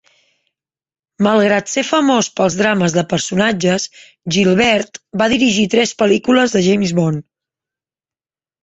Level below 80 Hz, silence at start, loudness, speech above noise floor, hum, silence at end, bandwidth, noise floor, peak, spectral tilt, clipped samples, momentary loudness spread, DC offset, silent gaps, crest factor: -52 dBFS; 1.2 s; -15 LUFS; over 76 dB; none; 1.45 s; 8.2 kHz; under -90 dBFS; 0 dBFS; -4.5 dB/octave; under 0.1%; 7 LU; under 0.1%; none; 16 dB